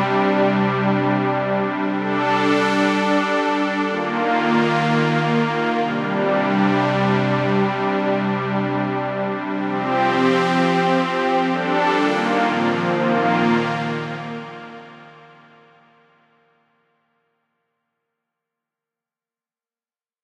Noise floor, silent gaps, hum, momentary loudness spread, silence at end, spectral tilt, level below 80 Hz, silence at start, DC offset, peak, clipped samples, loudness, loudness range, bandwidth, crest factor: under -90 dBFS; none; none; 6 LU; 5.15 s; -6.5 dB/octave; -62 dBFS; 0 s; under 0.1%; -6 dBFS; under 0.1%; -19 LUFS; 5 LU; 10.5 kHz; 14 dB